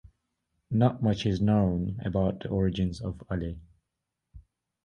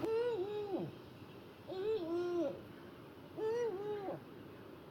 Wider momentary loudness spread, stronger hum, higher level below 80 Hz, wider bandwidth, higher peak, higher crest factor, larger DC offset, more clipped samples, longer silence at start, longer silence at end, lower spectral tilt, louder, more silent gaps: second, 9 LU vs 16 LU; neither; first, -46 dBFS vs -76 dBFS; second, 9 kHz vs 18 kHz; first, -8 dBFS vs -24 dBFS; about the same, 20 dB vs 16 dB; neither; neither; first, 0.7 s vs 0 s; first, 0.45 s vs 0 s; first, -8.5 dB/octave vs -7 dB/octave; first, -28 LUFS vs -40 LUFS; neither